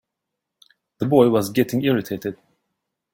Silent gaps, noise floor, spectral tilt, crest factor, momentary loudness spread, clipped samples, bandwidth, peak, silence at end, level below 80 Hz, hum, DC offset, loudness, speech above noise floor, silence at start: none; -82 dBFS; -6.5 dB/octave; 20 dB; 13 LU; under 0.1%; 17 kHz; -2 dBFS; 0.8 s; -60 dBFS; none; under 0.1%; -20 LUFS; 63 dB; 1 s